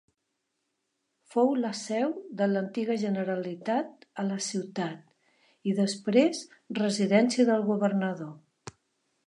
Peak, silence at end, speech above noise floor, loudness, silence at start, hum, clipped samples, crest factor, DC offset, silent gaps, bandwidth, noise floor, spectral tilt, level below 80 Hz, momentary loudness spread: -10 dBFS; 0.55 s; 53 dB; -28 LUFS; 1.35 s; none; under 0.1%; 20 dB; under 0.1%; none; 11 kHz; -81 dBFS; -5.5 dB/octave; -80 dBFS; 15 LU